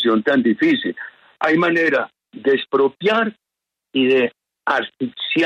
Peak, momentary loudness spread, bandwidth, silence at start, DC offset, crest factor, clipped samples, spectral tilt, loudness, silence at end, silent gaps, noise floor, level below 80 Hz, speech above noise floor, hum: -4 dBFS; 11 LU; 8.2 kHz; 0 s; under 0.1%; 14 dB; under 0.1%; -6 dB/octave; -19 LUFS; 0 s; none; -83 dBFS; -68 dBFS; 66 dB; none